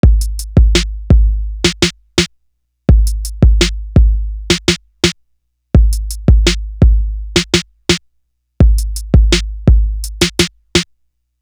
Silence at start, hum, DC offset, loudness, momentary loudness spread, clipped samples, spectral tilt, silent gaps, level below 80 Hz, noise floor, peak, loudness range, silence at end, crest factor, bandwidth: 0.05 s; none; under 0.1%; -14 LUFS; 6 LU; under 0.1%; -4.5 dB/octave; none; -14 dBFS; -63 dBFS; 0 dBFS; 1 LU; 0.6 s; 12 dB; 13 kHz